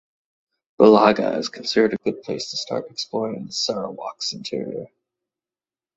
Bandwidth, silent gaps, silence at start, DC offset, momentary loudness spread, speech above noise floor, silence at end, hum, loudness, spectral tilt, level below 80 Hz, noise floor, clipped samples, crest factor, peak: 8 kHz; none; 0.8 s; under 0.1%; 14 LU; over 69 dB; 1.1 s; none; -21 LUFS; -4.5 dB/octave; -62 dBFS; under -90 dBFS; under 0.1%; 20 dB; -2 dBFS